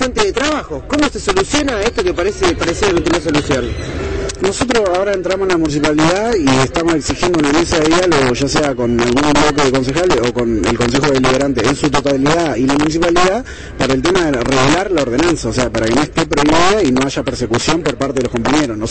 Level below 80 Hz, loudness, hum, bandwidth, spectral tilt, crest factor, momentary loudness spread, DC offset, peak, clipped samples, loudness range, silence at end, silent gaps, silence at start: -30 dBFS; -14 LUFS; none; 8.8 kHz; -4.5 dB/octave; 14 dB; 5 LU; 1%; 0 dBFS; under 0.1%; 2 LU; 0 s; none; 0 s